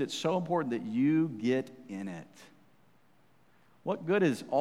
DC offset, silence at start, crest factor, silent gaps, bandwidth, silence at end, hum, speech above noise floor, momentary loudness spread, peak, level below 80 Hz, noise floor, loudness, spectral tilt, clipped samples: under 0.1%; 0 s; 16 dB; none; 14 kHz; 0 s; none; 36 dB; 14 LU; -16 dBFS; -82 dBFS; -67 dBFS; -31 LUFS; -6 dB/octave; under 0.1%